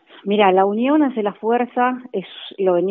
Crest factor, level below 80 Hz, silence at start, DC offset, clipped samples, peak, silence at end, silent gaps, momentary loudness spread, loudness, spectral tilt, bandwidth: 18 dB; -74 dBFS; 0.25 s; under 0.1%; under 0.1%; 0 dBFS; 0 s; none; 13 LU; -18 LUFS; -4 dB/octave; 4.1 kHz